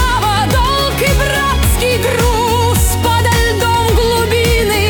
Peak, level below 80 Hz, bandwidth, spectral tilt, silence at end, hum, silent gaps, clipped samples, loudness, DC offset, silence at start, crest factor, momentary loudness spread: 0 dBFS; -20 dBFS; 19 kHz; -4 dB/octave; 0 s; none; none; under 0.1%; -12 LUFS; under 0.1%; 0 s; 12 dB; 1 LU